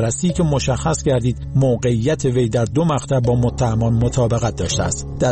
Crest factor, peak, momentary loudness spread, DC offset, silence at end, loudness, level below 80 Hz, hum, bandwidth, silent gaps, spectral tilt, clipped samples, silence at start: 10 dB; -6 dBFS; 3 LU; under 0.1%; 0 s; -18 LUFS; -32 dBFS; none; 8.8 kHz; none; -6 dB/octave; under 0.1%; 0 s